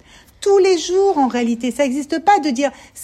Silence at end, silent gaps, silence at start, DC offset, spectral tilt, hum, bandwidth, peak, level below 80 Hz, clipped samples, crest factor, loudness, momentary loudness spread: 0 s; none; 0.4 s; under 0.1%; -3.5 dB/octave; none; 13 kHz; -2 dBFS; -54 dBFS; under 0.1%; 14 dB; -17 LUFS; 7 LU